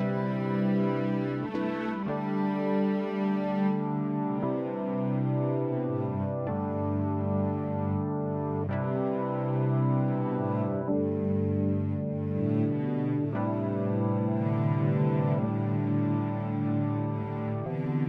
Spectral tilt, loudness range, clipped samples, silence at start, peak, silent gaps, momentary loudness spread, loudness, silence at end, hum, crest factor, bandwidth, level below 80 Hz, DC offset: -11 dB/octave; 2 LU; under 0.1%; 0 s; -16 dBFS; none; 4 LU; -29 LUFS; 0 s; none; 12 dB; 5.4 kHz; -64 dBFS; under 0.1%